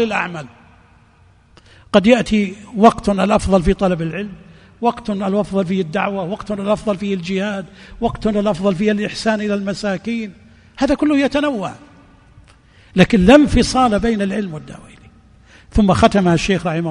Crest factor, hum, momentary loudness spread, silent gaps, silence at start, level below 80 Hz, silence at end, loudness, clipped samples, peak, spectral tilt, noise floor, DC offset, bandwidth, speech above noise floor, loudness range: 18 dB; none; 12 LU; none; 0 s; -34 dBFS; 0 s; -17 LUFS; under 0.1%; 0 dBFS; -6 dB/octave; -50 dBFS; under 0.1%; 10.5 kHz; 34 dB; 5 LU